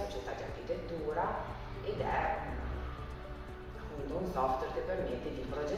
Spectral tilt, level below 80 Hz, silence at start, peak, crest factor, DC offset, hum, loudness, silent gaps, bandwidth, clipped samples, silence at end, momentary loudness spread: -6.5 dB/octave; -46 dBFS; 0 s; -20 dBFS; 16 dB; under 0.1%; none; -38 LUFS; none; 15.5 kHz; under 0.1%; 0 s; 11 LU